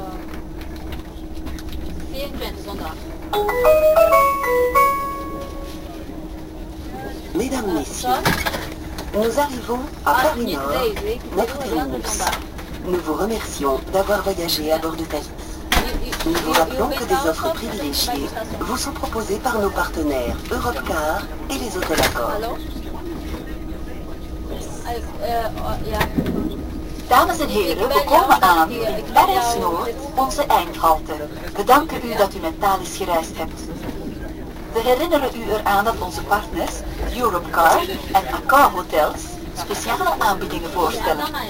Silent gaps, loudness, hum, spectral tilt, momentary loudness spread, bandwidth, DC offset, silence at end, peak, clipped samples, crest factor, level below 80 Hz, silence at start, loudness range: none; -20 LUFS; none; -4 dB/octave; 16 LU; 16 kHz; under 0.1%; 0 s; 0 dBFS; under 0.1%; 20 dB; -32 dBFS; 0 s; 8 LU